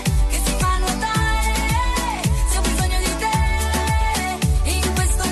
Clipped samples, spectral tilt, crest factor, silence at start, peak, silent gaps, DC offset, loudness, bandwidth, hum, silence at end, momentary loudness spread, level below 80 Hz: under 0.1%; -4 dB/octave; 10 dB; 0 s; -8 dBFS; none; under 0.1%; -20 LUFS; 12.5 kHz; none; 0 s; 1 LU; -22 dBFS